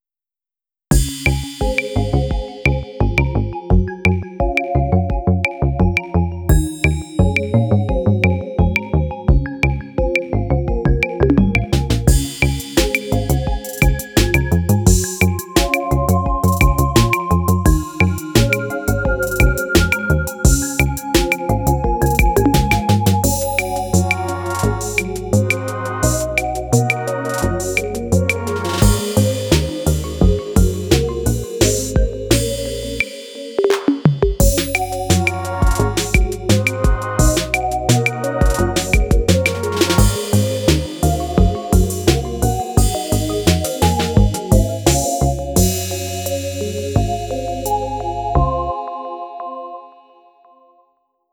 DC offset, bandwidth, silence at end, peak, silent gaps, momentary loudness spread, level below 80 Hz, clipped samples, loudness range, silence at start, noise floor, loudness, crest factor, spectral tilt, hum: under 0.1%; over 20 kHz; 1.45 s; 0 dBFS; none; 6 LU; -22 dBFS; under 0.1%; 3 LU; 0.9 s; under -90 dBFS; -17 LUFS; 16 dB; -5 dB/octave; none